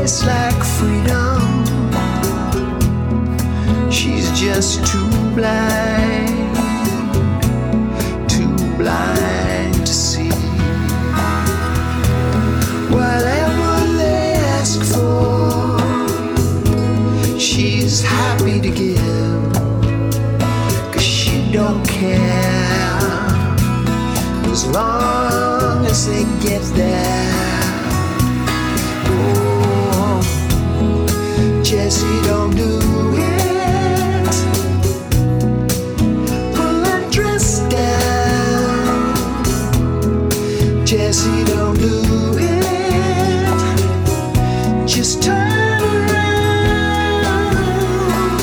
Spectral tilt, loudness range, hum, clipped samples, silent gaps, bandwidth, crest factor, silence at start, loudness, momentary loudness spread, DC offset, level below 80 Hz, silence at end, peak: -5 dB/octave; 2 LU; none; under 0.1%; none; over 20 kHz; 10 dB; 0 s; -16 LUFS; 3 LU; under 0.1%; -26 dBFS; 0 s; -4 dBFS